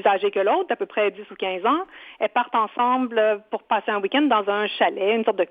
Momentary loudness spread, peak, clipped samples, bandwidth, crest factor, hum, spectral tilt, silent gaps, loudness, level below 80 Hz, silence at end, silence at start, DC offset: 5 LU; -6 dBFS; under 0.1%; 4.9 kHz; 16 dB; none; -6.5 dB/octave; none; -22 LUFS; -74 dBFS; 0.05 s; 0 s; under 0.1%